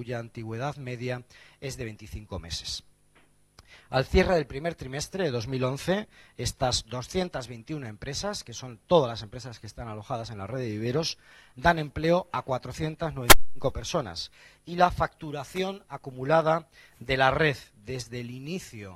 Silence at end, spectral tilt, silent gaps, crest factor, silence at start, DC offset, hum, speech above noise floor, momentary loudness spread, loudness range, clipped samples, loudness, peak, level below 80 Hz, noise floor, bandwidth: 0 s; -4 dB/octave; none; 28 dB; 0 s; under 0.1%; none; 34 dB; 16 LU; 6 LU; under 0.1%; -28 LUFS; 0 dBFS; -42 dBFS; -62 dBFS; 16 kHz